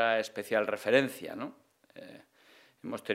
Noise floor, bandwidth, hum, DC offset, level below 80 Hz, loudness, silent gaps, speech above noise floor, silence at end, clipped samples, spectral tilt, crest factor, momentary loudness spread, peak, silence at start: -62 dBFS; 16 kHz; none; under 0.1%; -84 dBFS; -31 LUFS; none; 30 dB; 0 s; under 0.1%; -4.5 dB/octave; 22 dB; 23 LU; -10 dBFS; 0 s